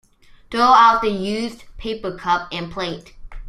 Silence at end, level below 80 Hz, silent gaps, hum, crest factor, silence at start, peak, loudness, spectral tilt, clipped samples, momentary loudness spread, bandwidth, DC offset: 0 s; -42 dBFS; none; none; 18 dB; 0.5 s; -2 dBFS; -18 LUFS; -4.5 dB/octave; under 0.1%; 18 LU; 13.5 kHz; under 0.1%